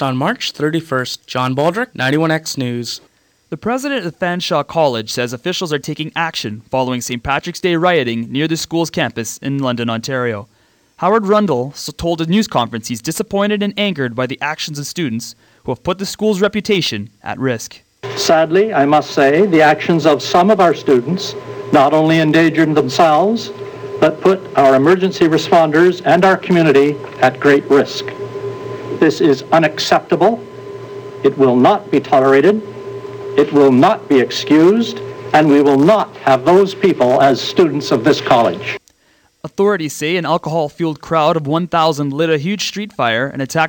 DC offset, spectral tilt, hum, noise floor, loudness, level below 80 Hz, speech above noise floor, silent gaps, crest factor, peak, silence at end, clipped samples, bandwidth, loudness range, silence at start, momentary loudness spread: under 0.1%; -5.5 dB/octave; none; -55 dBFS; -14 LUFS; -50 dBFS; 41 dB; none; 14 dB; 0 dBFS; 0 s; under 0.1%; 19 kHz; 7 LU; 0 s; 13 LU